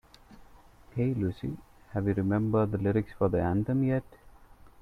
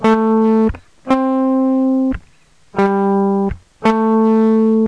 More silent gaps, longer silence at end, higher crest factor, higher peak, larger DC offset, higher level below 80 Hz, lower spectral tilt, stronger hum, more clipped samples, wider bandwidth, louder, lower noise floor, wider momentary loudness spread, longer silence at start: neither; first, 0.5 s vs 0 s; about the same, 16 dB vs 14 dB; second, -14 dBFS vs 0 dBFS; second, under 0.1% vs 0.3%; second, -52 dBFS vs -38 dBFS; first, -10 dB/octave vs -8.5 dB/octave; neither; neither; second, 5.2 kHz vs 7.8 kHz; second, -30 LUFS vs -15 LUFS; about the same, -54 dBFS vs -51 dBFS; first, 11 LU vs 8 LU; first, 0.3 s vs 0 s